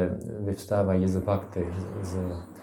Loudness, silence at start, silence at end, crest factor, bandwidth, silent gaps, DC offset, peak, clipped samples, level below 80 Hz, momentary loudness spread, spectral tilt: -29 LUFS; 0 s; 0 s; 16 dB; 17 kHz; none; under 0.1%; -12 dBFS; under 0.1%; -56 dBFS; 8 LU; -8 dB/octave